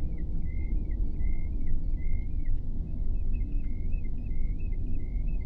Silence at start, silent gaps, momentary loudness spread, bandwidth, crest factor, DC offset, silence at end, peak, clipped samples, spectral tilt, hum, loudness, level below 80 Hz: 0 s; none; 2 LU; 2.7 kHz; 12 dB; under 0.1%; 0 s; -16 dBFS; under 0.1%; -11 dB/octave; none; -36 LUFS; -28 dBFS